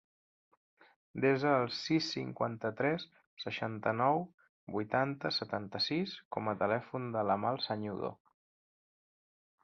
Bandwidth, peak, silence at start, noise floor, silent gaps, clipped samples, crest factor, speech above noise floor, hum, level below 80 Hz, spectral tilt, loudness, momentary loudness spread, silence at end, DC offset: 7.6 kHz; -16 dBFS; 1.15 s; under -90 dBFS; 3.27-3.37 s, 4.34-4.38 s, 4.49-4.67 s, 6.25-6.31 s; under 0.1%; 20 dB; over 56 dB; none; -72 dBFS; -3.5 dB/octave; -34 LUFS; 10 LU; 1.5 s; under 0.1%